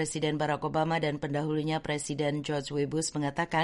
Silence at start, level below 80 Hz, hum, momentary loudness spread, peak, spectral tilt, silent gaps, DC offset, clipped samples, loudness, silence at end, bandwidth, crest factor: 0 s; -58 dBFS; none; 3 LU; -16 dBFS; -5 dB/octave; none; under 0.1%; under 0.1%; -31 LUFS; 0 s; 11.5 kHz; 14 dB